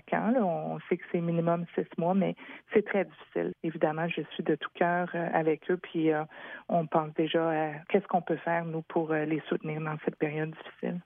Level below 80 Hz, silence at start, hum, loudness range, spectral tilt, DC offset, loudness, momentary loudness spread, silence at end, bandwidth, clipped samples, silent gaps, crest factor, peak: -78 dBFS; 0.05 s; none; 1 LU; -10.5 dB/octave; under 0.1%; -31 LUFS; 6 LU; 0.05 s; 3.8 kHz; under 0.1%; none; 18 dB; -12 dBFS